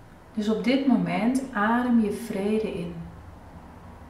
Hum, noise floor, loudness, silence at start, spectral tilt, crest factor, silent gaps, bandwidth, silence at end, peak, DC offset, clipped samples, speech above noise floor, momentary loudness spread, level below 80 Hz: none; -45 dBFS; -25 LUFS; 0 s; -6.5 dB/octave; 16 dB; none; 14.5 kHz; 0 s; -10 dBFS; under 0.1%; under 0.1%; 21 dB; 24 LU; -52 dBFS